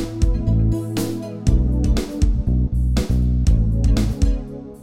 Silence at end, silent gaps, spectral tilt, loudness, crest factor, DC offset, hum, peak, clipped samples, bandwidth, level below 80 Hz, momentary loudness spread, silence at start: 0 s; none; -7 dB/octave; -20 LUFS; 14 dB; under 0.1%; none; -4 dBFS; under 0.1%; 15 kHz; -20 dBFS; 5 LU; 0 s